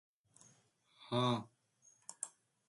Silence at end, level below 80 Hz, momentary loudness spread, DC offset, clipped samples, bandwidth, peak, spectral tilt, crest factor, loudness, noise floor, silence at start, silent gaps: 0.4 s; -82 dBFS; 23 LU; under 0.1%; under 0.1%; 11.5 kHz; -24 dBFS; -5 dB/octave; 20 dB; -39 LUFS; -72 dBFS; 1 s; none